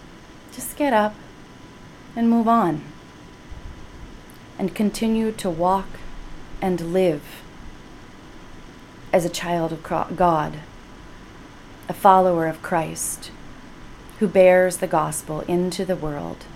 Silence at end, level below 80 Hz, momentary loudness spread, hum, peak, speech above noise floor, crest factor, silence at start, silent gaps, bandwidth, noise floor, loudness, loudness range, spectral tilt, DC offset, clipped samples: 0 s; -44 dBFS; 26 LU; none; 0 dBFS; 23 dB; 22 dB; 0 s; none; 16.5 kHz; -43 dBFS; -21 LUFS; 5 LU; -5.5 dB/octave; under 0.1%; under 0.1%